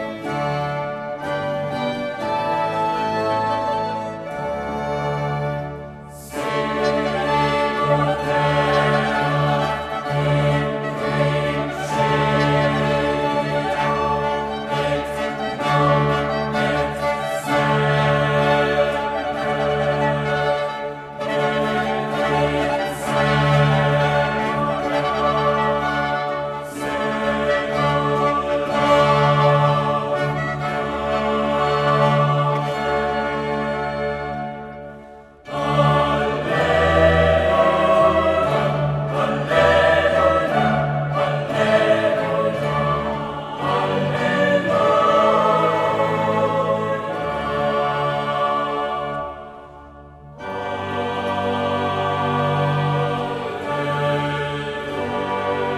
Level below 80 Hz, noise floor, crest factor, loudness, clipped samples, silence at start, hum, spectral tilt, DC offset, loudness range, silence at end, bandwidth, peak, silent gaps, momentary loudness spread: -42 dBFS; -42 dBFS; 18 dB; -20 LUFS; under 0.1%; 0 s; none; -6.5 dB/octave; under 0.1%; 6 LU; 0 s; 13.5 kHz; -2 dBFS; none; 9 LU